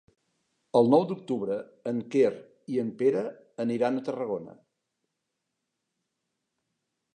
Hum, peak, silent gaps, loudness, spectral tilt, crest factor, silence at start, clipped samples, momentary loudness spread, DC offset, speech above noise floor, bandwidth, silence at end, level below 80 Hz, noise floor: none; -8 dBFS; none; -28 LUFS; -7.5 dB/octave; 20 dB; 0.75 s; under 0.1%; 11 LU; under 0.1%; 56 dB; 9.6 kHz; 2.65 s; -78 dBFS; -83 dBFS